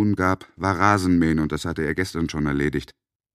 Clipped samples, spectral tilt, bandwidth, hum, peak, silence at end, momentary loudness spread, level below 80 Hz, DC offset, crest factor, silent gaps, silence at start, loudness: under 0.1%; -6.5 dB/octave; 15 kHz; none; 0 dBFS; 0.5 s; 7 LU; -42 dBFS; under 0.1%; 22 dB; none; 0 s; -22 LUFS